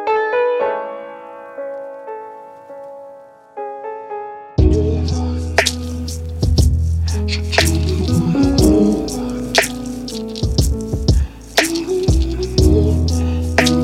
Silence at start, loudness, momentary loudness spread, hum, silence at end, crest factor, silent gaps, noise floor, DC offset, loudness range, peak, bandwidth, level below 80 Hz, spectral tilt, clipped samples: 0 s; -17 LUFS; 17 LU; none; 0 s; 16 dB; none; -40 dBFS; under 0.1%; 11 LU; 0 dBFS; 16 kHz; -22 dBFS; -5.5 dB/octave; under 0.1%